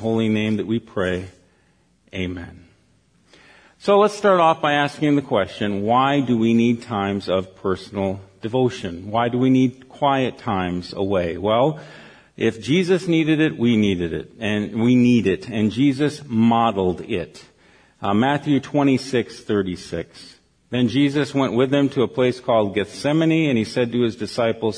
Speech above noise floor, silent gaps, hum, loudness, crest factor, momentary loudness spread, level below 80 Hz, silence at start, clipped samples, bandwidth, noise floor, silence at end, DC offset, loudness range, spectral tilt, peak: 40 dB; none; none; -20 LUFS; 16 dB; 11 LU; -54 dBFS; 0 s; under 0.1%; 10.5 kHz; -60 dBFS; 0 s; under 0.1%; 4 LU; -6.5 dB/octave; -4 dBFS